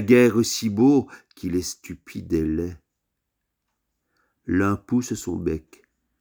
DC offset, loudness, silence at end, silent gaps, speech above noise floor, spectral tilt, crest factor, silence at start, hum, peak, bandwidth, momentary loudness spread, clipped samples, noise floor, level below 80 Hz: under 0.1%; -23 LUFS; 0.6 s; none; 58 dB; -5.5 dB/octave; 20 dB; 0 s; none; -2 dBFS; over 20 kHz; 18 LU; under 0.1%; -80 dBFS; -48 dBFS